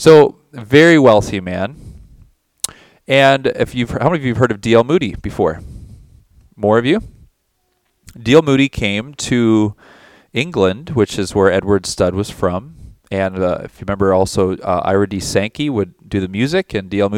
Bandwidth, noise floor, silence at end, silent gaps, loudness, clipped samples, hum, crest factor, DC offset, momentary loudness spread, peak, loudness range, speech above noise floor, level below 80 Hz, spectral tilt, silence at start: 16.5 kHz; -65 dBFS; 0 s; none; -15 LUFS; 0.2%; none; 16 dB; under 0.1%; 12 LU; 0 dBFS; 3 LU; 51 dB; -40 dBFS; -5.5 dB/octave; 0 s